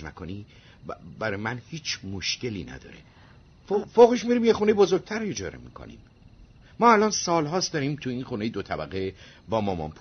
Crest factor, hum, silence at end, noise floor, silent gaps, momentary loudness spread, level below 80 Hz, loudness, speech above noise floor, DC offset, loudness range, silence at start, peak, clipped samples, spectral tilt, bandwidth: 22 dB; none; 0.1 s; -52 dBFS; none; 22 LU; -54 dBFS; -25 LUFS; 27 dB; under 0.1%; 9 LU; 0 s; -4 dBFS; under 0.1%; -4.5 dB/octave; 6.6 kHz